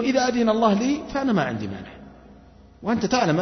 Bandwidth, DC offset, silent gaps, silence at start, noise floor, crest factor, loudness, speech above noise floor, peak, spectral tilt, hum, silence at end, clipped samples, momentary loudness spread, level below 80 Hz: 6.4 kHz; under 0.1%; none; 0 s; -49 dBFS; 18 dB; -23 LUFS; 27 dB; -6 dBFS; -5.5 dB/octave; none; 0 s; under 0.1%; 14 LU; -50 dBFS